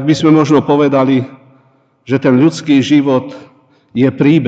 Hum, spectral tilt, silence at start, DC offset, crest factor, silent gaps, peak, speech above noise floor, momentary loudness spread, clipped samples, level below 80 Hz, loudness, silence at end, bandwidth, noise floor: none; -7 dB/octave; 0 s; under 0.1%; 12 dB; none; 0 dBFS; 42 dB; 8 LU; under 0.1%; -58 dBFS; -11 LUFS; 0 s; 8 kHz; -52 dBFS